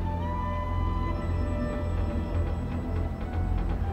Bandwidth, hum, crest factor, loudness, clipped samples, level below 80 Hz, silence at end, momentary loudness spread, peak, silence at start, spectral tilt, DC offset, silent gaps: 8.4 kHz; none; 12 dB; -31 LUFS; under 0.1%; -32 dBFS; 0 s; 2 LU; -16 dBFS; 0 s; -8.5 dB/octave; under 0.1%; none